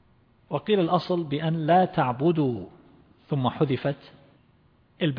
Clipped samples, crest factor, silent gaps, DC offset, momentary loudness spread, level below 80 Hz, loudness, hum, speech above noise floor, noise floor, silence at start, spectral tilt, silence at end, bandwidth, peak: under 0.1%; 18 dB; none; under 0.1%; 12 LU; -62 dBFS; -25 LUFS; none; 37 dB; -61 dBFS; 0.5 s; -9.5 dB/octave; 0 s; 5.4 kHz; -8 dBFS